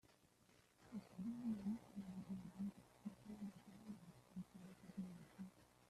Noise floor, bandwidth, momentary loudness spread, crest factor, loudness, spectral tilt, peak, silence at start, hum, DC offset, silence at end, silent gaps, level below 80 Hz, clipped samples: -74 dBFS; 14 kHz; 12 LU; 16 dB; -54 LUFS; -7.5 dB/octave; -38 dBFS; 0.05 s; none; under 0.1%; 0 s; none; -80 dBFS; under 0.1%